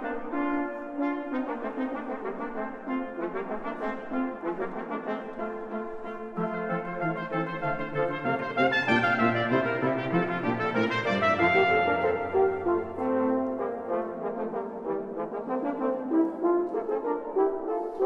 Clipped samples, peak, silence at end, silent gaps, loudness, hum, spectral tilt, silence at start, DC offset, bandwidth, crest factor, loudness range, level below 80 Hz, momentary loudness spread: under 0.1%; -10 dBFS; 0 s; none; -29 LUFS; none; -7 dB/octave; 0 s; under 0.1%; 8 kHz; 18 dB; 8 LU; -60 dBFS; 10 LU